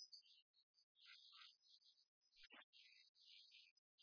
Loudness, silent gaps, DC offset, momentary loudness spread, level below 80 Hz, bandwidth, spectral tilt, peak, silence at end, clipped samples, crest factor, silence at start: -66 LUFS; 0.42-0.54 s, 0.63-0.74 s, 0.83-0.95 s, 2.08-2.21 s, 2.64-2.73 s, 3.09-3.15 s, 3.71-3.98 s; under 0.1%; 5 LU; under -90 dBFS; 5.4 kHz; 4.5 dB/octave; -48 dBFS; 0 s; under 0.1%; 20 dB; 0 s